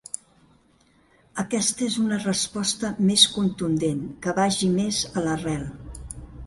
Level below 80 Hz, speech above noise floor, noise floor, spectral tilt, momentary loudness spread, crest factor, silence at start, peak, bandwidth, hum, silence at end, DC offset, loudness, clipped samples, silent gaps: -48 dBFS; 37 dB; -60 dBFS; -3.5 dB/octave; 19 LU; 24 dB; 0.15 s; -2 dBFS; 12 kHz; none; 0 s; under 0.1%; -23 LUFS; under 0.1%; none